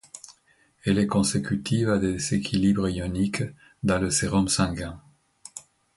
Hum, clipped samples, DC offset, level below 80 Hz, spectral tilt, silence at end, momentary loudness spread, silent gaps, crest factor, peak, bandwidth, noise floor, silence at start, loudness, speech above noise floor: none; under 0.1%; under 0.1%; -46 dBFS; -5 dB/octave; 0.35 s; 19 LU; none; 18 dB; -8 dBFS; 11.5 kHz; -63 dBFS; 0.15 s; -25 LUFS; 39 dB